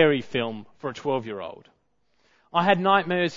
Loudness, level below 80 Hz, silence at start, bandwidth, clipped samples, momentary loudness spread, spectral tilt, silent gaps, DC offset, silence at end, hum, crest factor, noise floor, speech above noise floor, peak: -24 LUFS; -66 dBFS; 0 s; 7.6 kHz; under 0.1%; 15 LU; -6.5 dB/octave; none; under 0.1%; 0 s; none; 22 dB; -70 dBFS; 46 dB; -4 dBFS